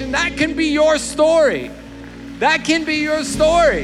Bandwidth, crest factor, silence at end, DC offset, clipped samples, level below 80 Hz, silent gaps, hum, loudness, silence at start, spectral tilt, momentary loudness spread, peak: 13 kHz; 14 dB; 0 s; under 0.1%; under 0.1%; -38 dBFS; none; none; -16 LUFS; 0 s; -3.5 dB/octave; 20 LU; -2 dBFS